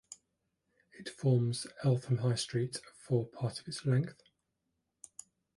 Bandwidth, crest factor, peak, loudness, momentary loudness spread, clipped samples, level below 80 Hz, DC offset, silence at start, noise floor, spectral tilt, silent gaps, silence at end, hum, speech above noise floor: 11.5 kHz; 18 dB; -18 dBFS; -34 LUFS; 20 LU; under 0.1%; -72 dBFS; under 0.1%; 0.1 s; -84 dBFS; -6 dB/octave; none; 1.45 s; none; 51 dB